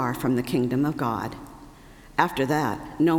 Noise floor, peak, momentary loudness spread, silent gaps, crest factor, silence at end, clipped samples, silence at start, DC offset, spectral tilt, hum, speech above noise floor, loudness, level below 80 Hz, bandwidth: -47 dBFS; -4 dBFS; 10 LU; none; 22 dB; 0 s; under 0.1%; 0 s; under 0.1%; -6.5 dB/octave; none; 23 dB; -25 LUFS; -50 dBFS; 20 kHz